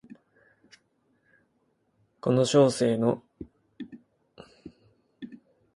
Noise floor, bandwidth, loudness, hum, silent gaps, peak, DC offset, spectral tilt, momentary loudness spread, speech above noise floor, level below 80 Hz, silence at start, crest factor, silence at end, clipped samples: -72 dBFS; 11.5 kHz; -24 LUFS; none; none; -8 dBFS; under 0.1%; -6 dB/octave; 26 LU; 49 dB; -66 dBFS; 2.25 s; 22 dB; 0.4 s; under 0.1%